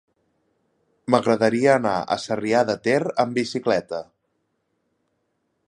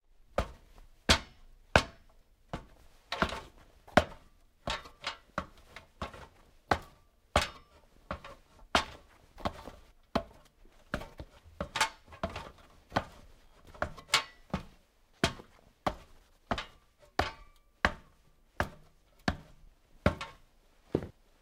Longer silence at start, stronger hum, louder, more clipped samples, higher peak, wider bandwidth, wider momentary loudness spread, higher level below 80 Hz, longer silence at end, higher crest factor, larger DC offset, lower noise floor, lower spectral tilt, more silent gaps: first, 1.1 s vs 0.4 s; neither; first, -21 LUFS vs -35 LUFS; neither; about the same, -2 dBFS vs -4 dBFS; second, 11.5 kHz vs 16 kHz; second, 7 LU vs 22 LU; second, -64 dBFS vs -50 dBFS; first, 1.65 s vs 0.3 s; second, 22 dB vs 34 dB; neither; first, -73 dBFS vs -64 dBFS; first, -5.5 dB/octave vs -3.5 dB/octave; neither